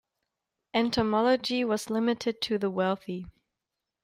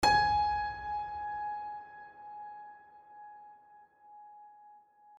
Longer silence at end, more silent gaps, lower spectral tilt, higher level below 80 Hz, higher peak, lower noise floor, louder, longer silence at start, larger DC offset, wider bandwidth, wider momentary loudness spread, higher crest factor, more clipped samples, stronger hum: first, 0.75 s vs 0.4 s; neither; first, -5 dB/octave vs -3 dB/octave; about the same, -60 dBFS vs -56 dBFS; about the same, -12 dBFS vs -14 dBFS; first, -87 dBFS vs -59 dBFS; first, -28 LUFS vs -33 LUFS; first, 0.75 s vs 0 s; neither; first, 16 kHz vs 13 kHz; second, 7 LU vs 26 LU; about the same, 18 dB vs 22 dB; neither; neither